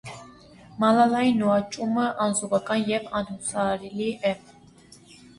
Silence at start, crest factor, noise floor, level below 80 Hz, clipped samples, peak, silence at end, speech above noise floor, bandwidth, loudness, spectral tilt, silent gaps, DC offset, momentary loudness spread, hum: 0.05 s; 18 dB; -52 dBFS; -60 dBFS; under 0.1%; -6 dBFS; 1 s; 28 dB; 11.5 kHz; -24 LUFS; -4.5 dB/octave; none; under 0.1%; 11 LU; none